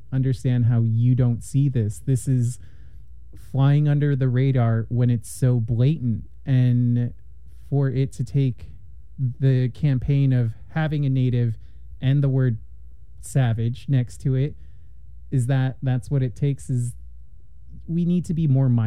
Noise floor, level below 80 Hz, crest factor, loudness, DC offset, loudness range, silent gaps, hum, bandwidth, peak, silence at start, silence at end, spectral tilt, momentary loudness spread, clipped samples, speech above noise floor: -47 dBFS; -44 dBFS; 14 dB; -22 LUFS; 1%; 4 LU; none; none; 11.5 kHz; -8 dBFS; 0.1 s; 0 s; -8.5 dB/octave; 8 LU; under 0.1%; 26 dB